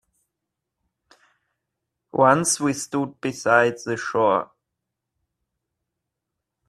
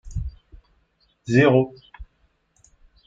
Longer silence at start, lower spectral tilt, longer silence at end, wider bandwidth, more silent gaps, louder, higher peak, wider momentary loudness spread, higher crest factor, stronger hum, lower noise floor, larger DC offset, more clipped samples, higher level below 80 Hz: first, 2.15 s vs 0.05 s; second, -4 dB/octave vs -7.5 dB/octave; first, 2.25 s vs 1.05 s; first, 14.5 kHz vs 7.6 kHz; neither; about the same, -21 LUFS vs -20 LUFS; about the same, -2 dBFS vs -4 dBFS; second, 11 LU vs 21 LU; about the same, 24 dB vs 20 dB; neither; first, -83 dBFS vs -65 dBFS; neither; neither; second, -66 dBFS vs -40 dBFS